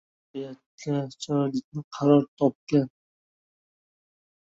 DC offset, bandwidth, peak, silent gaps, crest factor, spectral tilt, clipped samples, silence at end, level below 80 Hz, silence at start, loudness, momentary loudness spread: under 0.1%; 7.8 kHz; -8 dBFS; 0.66-0.78 s, 1.64-1.72 s, 1.84-1.91 s, 2.28-2.37 s, 2.55-2.67 s; 20 dB; -7.5 dB/octave; under 0.1%; 1.65 s; -68 dBFS; 0.35 s; -26 LUFS; 17 LU